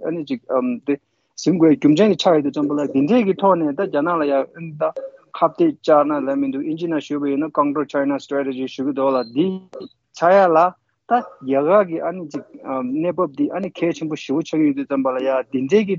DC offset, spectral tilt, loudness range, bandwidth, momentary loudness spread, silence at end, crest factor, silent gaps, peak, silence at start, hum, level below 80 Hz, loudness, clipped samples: under 0.1%; -6.5 dB/octave; 4 LU; 7.4 kHz; 11 LU; 0 s; 16 dB; none; -4 dBFS; 0 s; none; -68 dBFS; -19 LUFS; under 0.1%